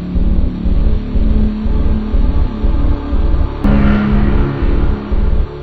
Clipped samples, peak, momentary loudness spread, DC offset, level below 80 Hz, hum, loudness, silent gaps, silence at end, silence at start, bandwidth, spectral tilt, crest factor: under 0.1%; 0 dBFS; 5 LU; 0.9%; -14 dBFS; none; -16 LUFS; none; 0 s; 0 s; 4.8 kHz; -10 dB/octave; 12 dB